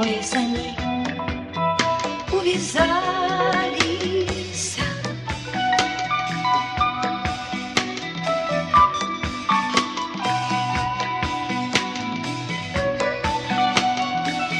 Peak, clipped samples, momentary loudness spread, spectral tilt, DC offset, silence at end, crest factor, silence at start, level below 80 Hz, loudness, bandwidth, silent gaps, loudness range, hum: -4 dBFS; under 0.1%; 7 LU; -3.5 dB/octave; under 0.1%; 0 s; 20 dB; 0 s; -44 dBFS; -22 LUFS; 12 kHz; none; 2 LU; none